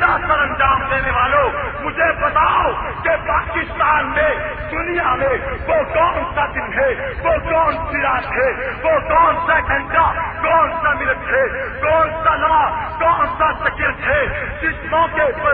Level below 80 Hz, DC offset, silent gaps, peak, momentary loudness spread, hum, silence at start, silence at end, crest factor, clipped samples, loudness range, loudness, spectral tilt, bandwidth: -32 dBFS; under 0.1%; none; -2 dBFS; 6 LU; none; 0 s; 0 s; 14 dB; under 0.1%; 2 LU; -17 LUFS; -9.5 dB/octave; 4.8 kHz